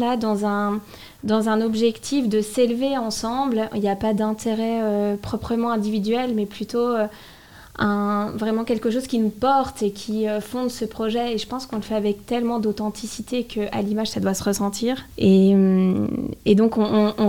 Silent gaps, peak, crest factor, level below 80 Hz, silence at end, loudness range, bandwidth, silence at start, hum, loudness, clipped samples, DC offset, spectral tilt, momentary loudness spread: none; -4 dBFS; 18 dB; -52 dBFS; 0 s; 5 LU; 17 kHz; 0 s; none; -22 LUFS; under 0.1%; 0.3%; -6 dB/octave; 9 LU